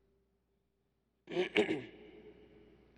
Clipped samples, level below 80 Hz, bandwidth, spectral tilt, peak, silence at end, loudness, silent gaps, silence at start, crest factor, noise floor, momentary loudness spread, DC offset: under 0.1%; -74 dBFS; 10.5 kHz; -5 dB/octave; -14 dBFS; 0.65 s; -35 LUFS; none; 1.25 s; 26 dB; -80 dBFS; 24 LU; under 0.1%